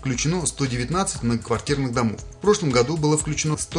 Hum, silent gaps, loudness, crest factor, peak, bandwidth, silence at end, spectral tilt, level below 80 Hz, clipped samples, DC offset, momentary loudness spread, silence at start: none; none; -22 LUFS; 16 dB; -6 dBFS; 11 kHz; 0 s; -4.5 dB/octave; -40 dBFS; under 0.1%; under 0.1%; 5 LU; 0 s